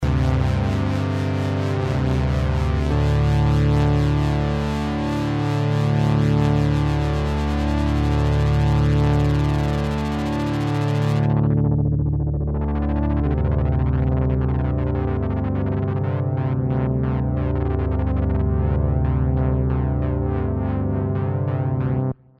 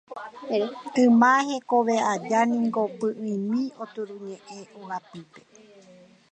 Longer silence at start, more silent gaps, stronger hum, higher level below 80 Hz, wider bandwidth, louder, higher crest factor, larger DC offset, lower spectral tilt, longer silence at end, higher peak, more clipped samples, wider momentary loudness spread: about the same, 0 s vs 0.1 s; neither; neither; first, -26 dBFS vs -78 dBFS; about the same, 9 kHz vs 8.6 kHz; about the same, -21 LUFS vs -23 LUFS; second, 12 dB vs 18 dB; neither; first, -8.5 dB/octave vs -5 dB/octave; second, 0.25 s vs 0.95 s; about the same, -8 dBFS vs -6 dBFS; neither; second, 5 LU vs 21 LU